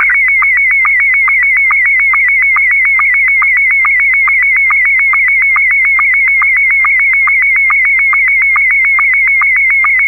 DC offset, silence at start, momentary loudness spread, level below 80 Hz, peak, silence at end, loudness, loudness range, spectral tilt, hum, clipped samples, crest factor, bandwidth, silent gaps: under 0.1%; 0 s; 0 LU; -40 dBFS; -4 dBFS; 0 s; -6 LUFS; 0 LU; -2.5 dB/octave; 50 Hz at -40 dBFS; under 0.1%; 4 dB; 14 kHz; none